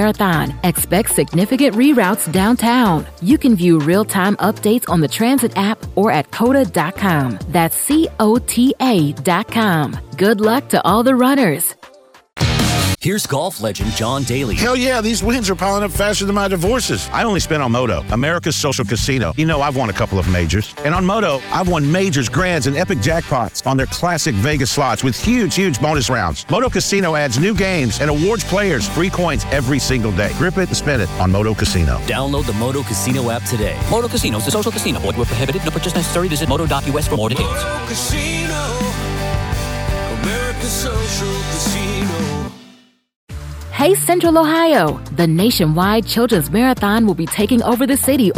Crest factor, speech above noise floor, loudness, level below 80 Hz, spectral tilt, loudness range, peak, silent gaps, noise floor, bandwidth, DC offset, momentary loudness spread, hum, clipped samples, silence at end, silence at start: 16 dB; 32 dB; -16 LUFS; -30 dBFS; -5 dB/octave; 5 LU; 0 dBFS; 43.16-43.27 s; -47 dBFS; 19 kHz; under 0.1%; 6 LU; none; under 0.1%; 0 s; 0 s